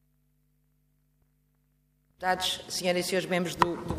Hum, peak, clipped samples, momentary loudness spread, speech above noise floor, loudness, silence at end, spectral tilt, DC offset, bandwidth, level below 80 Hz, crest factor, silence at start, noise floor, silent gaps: 50 Hz at -65 dBFS; -6 dBFS; under 0.1%; 3 LU; 41 dB; -29 LUFS; 0 s; -3.5 dB/octave; under 0.1%; 15.5 kHz; -58 dBFS; 26 dB; 2.2 s; -70 dBFS; none